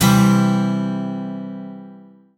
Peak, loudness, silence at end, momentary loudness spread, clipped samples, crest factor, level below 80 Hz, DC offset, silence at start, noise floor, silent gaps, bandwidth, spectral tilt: -2 dBFS; -18 LUFS; 0.4 s; 20 LU; under 0.1%; 16 dB; -46 dBFS; under 0.1%; 0 s; -43 dBFS; none; 17.5 kHz; -6 dB/octave